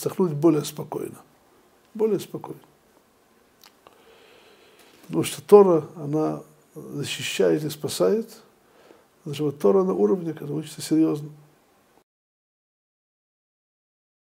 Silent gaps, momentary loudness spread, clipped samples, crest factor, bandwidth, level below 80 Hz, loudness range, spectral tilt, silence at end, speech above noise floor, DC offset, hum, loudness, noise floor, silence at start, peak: none; 18 LU; under 0.1%; 24 dB; 16 kHz; -74 dBFS; 11 LU; -6 dB/octave; 2.95 s; 37 dB; under 0.1%; none; -23 LUFS; -60 dBFS; 0 s; 0 dBFS